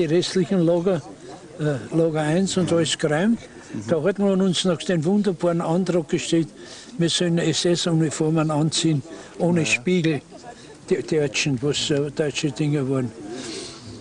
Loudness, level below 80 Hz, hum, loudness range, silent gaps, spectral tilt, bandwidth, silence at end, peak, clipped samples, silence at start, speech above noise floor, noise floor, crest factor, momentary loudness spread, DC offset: -22 LUFS; -56 dBFS; none; 2 LU; none; -5 dB/octave; 10.5 kHz; 0 s; -6 dBFS; under 0.1%; 0 s; 20 dB; -42 dBFS; 16 dB; 14 LU; under 0.1%